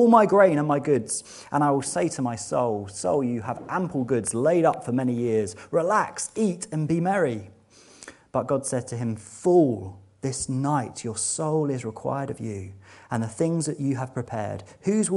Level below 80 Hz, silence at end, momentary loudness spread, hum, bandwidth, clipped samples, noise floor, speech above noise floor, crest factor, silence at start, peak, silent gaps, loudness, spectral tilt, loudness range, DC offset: -62 dBFS; 0 s; 11 LU; none; 11.5 kHz; under 0.1%; -53 dBFS; 29 dB; 22 dB; 0 s; -2 dBFS; none; -25 LUFS; -6 dB/octave; 4 LU; under 0.1%